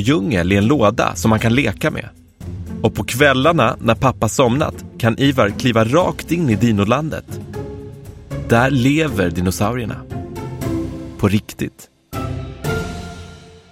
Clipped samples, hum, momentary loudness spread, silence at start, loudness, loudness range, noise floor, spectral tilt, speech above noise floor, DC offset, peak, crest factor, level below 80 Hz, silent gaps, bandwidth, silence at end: under 0.1%; none; 15 LU; 0 s; -17 LUFS; 7 LU; -38 dBFS; -6 dB/octave; 23 dB; under 0.1%; 0 dBFS; 16 dB; -38 dBFS; none; 16.5 kHz; 0.15 s